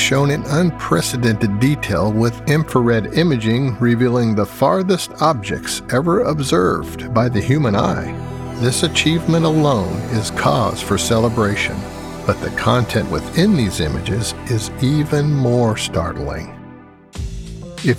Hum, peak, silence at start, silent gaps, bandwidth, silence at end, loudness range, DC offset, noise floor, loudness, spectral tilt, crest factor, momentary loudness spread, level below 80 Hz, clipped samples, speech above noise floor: none; 0 dBFS; 0 s; none; 16 kHz; 0 s; 2 LU; under 0.1%; -40 dBFS; -17 LUFS; -5.5 dB/octave; 16 dB; 8 LU; -38 dBFS; under 0.1%; 23 dB